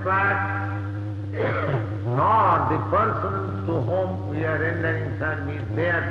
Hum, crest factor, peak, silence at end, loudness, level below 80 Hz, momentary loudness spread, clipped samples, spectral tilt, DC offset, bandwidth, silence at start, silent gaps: none; 14 dB; -8 dBFS; 0 s; -24 LUFS; -50 dBFS; 9 LU; under 0.1%; -9 dB/octave; under 0.1%; 5.8 kHz; 0 s; none